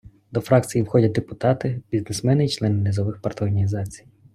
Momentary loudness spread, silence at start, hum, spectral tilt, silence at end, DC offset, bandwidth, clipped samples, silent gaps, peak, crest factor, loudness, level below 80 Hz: 8 LU; 0.05 s; none; -7 dB/octave; 0.35 s; under 0.1%; 13.5 kHz; under 0.1%; none; -2 dBFS; 20 dB; -22 LUFS; -52 dBFS